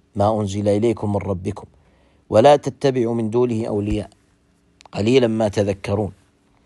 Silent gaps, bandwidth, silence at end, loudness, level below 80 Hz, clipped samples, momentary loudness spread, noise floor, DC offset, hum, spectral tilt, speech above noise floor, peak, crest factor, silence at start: none; 11.5 kHz; 0.55 s; -19 LUFS; -46 dBFS; under 0.1%; 13 LU; -59 dBFS; under 0.1%; none; -7 dB/octave; 41 dB; -2 dBFS; 18 dB; 0.15 s